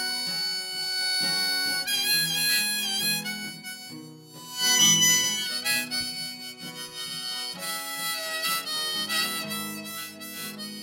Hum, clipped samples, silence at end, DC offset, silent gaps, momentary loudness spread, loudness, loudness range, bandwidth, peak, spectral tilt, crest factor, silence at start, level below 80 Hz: none; under 0.1%; 0 s; under 0.1%; none; 17 LU; -24 LUFS; 6 LU; 16.5 kHz; -8 dBFS; 0 dB/octave; 20 dB; 0 s; -74 dBFS